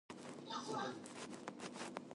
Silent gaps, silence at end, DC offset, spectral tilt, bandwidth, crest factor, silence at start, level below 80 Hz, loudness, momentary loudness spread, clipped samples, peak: none; 0 s; under 0.1%; -3.5 dB/octave; 11.5 kHz; 22 dB; 0.1 s; -86 dBFS; -48 LUFS; 7 LU; under 0.1%; -26 dBFS